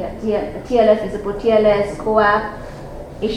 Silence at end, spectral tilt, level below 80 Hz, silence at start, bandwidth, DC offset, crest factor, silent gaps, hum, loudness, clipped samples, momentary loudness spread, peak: 0 s; -6.5 dB/octave; -38 dBFS; 0 s; 11 kHz; under 0.1%; 16 dB; none; none; -17 LUFS; under 0.1%; 18 LU; -2 dBFS